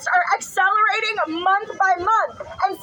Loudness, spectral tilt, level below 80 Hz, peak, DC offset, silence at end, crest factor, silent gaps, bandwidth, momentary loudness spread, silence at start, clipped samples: -19 LUFS; -2 dB/octave; -60 dBFS; -6 dBFS; under 0.1%; 0 s; 14 dB; none; 19.5 kHz; 7 LU; 0 s; under 0.1%